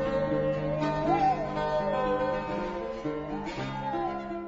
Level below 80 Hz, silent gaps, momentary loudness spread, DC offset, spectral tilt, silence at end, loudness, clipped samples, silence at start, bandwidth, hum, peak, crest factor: -48 dBFS; none; 8 LU; under 0.1%; -7 dB/octave; 0 s; -30 LUFS; under 0.1%; 0 s; 7.8 kHz; none; -14 dBFS; 14 dB